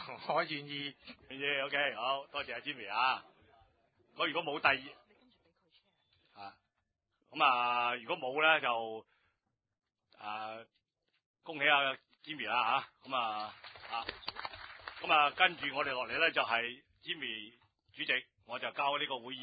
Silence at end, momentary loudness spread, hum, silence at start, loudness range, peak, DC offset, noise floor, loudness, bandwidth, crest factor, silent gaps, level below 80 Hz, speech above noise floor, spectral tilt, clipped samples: 0 s; 19 LU; none; 0 s; 5 LU; -10 dBFS; under 0.1%; -84 dBFS; -33 LUFS; 5 kHz; 26 dB; 11.26-11.34 s; -76 dBFS; 50 dB; -6 dB/octave; under 0.1%